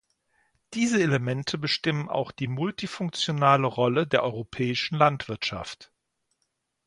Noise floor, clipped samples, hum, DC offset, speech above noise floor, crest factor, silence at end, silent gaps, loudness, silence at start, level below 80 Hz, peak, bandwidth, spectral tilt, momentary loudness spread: -78 dBFS; under 0.1%; none; under 0.1%; 52 dB; 22 dB; 1.05 s; none; -26 LUFS; 0.7 s; -60 dBFS; -4 dBFS; 11 kHz; -5.5 dB/octave; 9 LU